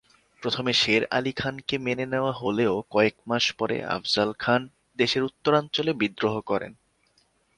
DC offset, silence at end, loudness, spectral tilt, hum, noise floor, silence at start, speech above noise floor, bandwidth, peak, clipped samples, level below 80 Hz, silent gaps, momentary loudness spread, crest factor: under 0.1%; 0.85 s; -25 LUFS; -4.5 dB/octave; none; -66 dBFS; 0.4 s; 41 dB; 11 kHz; -6 dBFS; under 0.1%; -60 dBFS; none; 7 LU; 20 dB